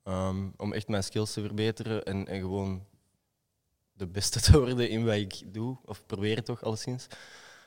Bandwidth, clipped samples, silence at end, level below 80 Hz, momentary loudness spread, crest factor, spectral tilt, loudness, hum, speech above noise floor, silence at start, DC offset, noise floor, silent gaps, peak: 16.5 kHz; under 0.1%; 0.1 s; -40 dBFS; 17 LU; 26 dB; -5 dB/octave; -30 LUFS; none; 50 dB; 0.05 s; under 0.1%; -79 dBFS; none; -4 dBFS